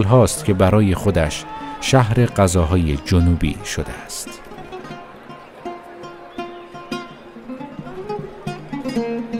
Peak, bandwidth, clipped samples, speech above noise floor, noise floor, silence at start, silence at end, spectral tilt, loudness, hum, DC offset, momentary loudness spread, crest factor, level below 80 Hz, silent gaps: 0 dBFS; 16 kHz; under 0.1%; 22 dB; -38 dBFS; 0 s; 0 s; -6 dB/octave; -19 LUFS; none; under 0.1%; 21 LU; 20 dB; -34 dBFS; none